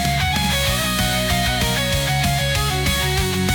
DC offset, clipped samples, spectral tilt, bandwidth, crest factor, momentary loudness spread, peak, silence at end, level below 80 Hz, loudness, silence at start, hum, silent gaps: under 0.1%; under 0.1%; -3.5 dB/octave; 19.5 kHz; 12 dB; 1 LU; -8 dBFS; 0 s; -28 dBFS; -18 LUFS; 0 s; none; none